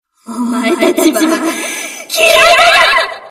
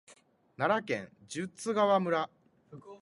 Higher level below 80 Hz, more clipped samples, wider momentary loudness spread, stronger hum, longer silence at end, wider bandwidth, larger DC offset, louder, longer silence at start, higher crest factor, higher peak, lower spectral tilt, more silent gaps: first, -46 dBFS vs -76 dBFS; first, 0.2% vs under 0.1%; about the same, 14 LU vs 14 LU; neither; about the same, 0 s vs 0.05 s; first, 16 kHz vs 11.5 kHz; neither; first, -9 LUFS vs -32 LUFS; first, 0.3 s vs 0.1 s; second, 10 dB vs 20 dB; first, 0 dBFS vs -14 dBFS; second, -1.5 dB/octave vs -5 dB/octave; neither